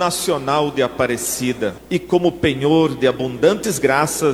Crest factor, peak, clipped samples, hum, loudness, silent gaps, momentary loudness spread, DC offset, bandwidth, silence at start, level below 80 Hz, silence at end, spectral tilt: 16 dB; -2 dBFS; under 0.1%; none; -18 LUFS; none; 5 LU; under 0.1%; 17 kHz; 0 s; -46 dBFS; 0 s; -4.5 dB/octave